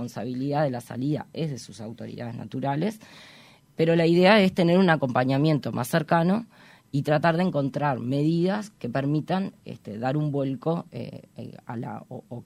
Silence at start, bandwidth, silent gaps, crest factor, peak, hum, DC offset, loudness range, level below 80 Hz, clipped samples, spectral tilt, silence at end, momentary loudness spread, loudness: 0 s; 16 kHz; none; 20 dB; -6 dBFS; none; under 0.1%; 9 LU; -64 dBFS; under 0.1%; -7 dB/octave; 0.05 s; 18 LU; -25 LUFS